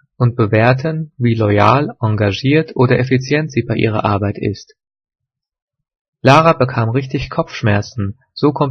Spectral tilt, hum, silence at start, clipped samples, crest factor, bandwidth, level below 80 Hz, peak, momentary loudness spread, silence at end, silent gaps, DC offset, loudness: -7.5 dB/octave; none; 0.2 s; 0.1%; 16 dB; 7 kHz; -46 dBFS; 0 dBFS; 10 LU; 0 s; 5.62-5.68 s, 6.01-6.13 s; under 0.1%; -15 LUFS